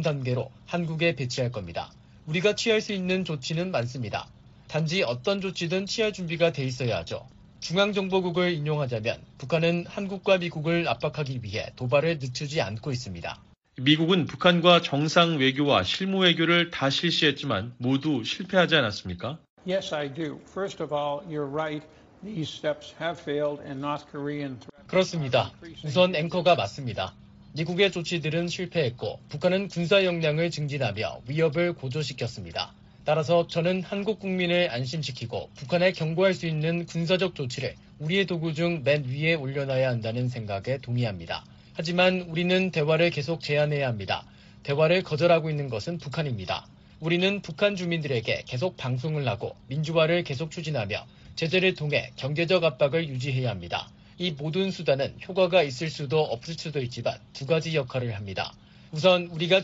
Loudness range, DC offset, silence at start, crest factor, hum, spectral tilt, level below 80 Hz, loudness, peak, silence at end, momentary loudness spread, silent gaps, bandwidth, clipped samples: 5 LU; under 0.1%; 0 s; 22 dB; none; -4 dB/octave; -58 dBFS; -26 LUFS; -6 dBFS; 0 s; 12 LU; 19.49-19.57 s; 8 kHz; under 0.1%